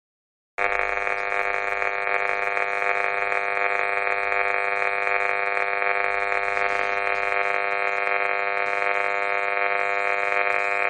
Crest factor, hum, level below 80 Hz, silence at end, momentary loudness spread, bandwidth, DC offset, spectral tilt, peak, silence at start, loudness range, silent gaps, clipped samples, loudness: 20 dB; none; -58 dBFS; 0 s; 2 LU; 9.8 kHz; under 0.1%; -2.5 dB/octave; -4 dBFS; 0.6 s; 1 LU; none; under 0.1%; -23 LUFS